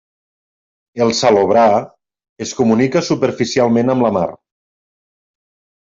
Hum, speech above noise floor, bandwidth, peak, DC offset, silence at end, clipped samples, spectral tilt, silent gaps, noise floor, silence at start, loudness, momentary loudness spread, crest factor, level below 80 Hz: none; over 76 dB; 7.8 kHz; -2 dBFS; under 0.1%; 1.5 s; under 0.1%; -5.5 dB/octave; 2.29-2.36 s; under -90 dBFS; 0.95 s; -14 LUFS; 13 LU; 14 dB; -56 dBFS